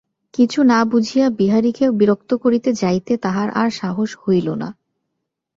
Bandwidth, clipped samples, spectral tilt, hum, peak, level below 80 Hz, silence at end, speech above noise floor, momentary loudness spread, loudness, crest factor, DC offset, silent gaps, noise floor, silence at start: 7.6 kHz; under 0.1%; -6.5 dB/octave; none; -2 dBFS; -58 dBFS; 0.85 s; 60 dB; 8 LU; -17 LUFS; 16 dB; under 0.1%; none; -77 dBFS; 0.4 s